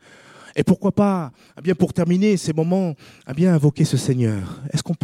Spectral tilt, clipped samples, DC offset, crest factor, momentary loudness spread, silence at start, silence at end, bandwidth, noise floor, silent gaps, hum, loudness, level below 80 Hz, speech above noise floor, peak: -7 dB/octave; under 0.1%; under 0.1%; 18 dB; 10 LU; 0.55 s; 0.05 s; 14.5 kHz; -45 dBFS; none; none; -20 LUFS; -52 dBFS; 26 dB; -2 dBFS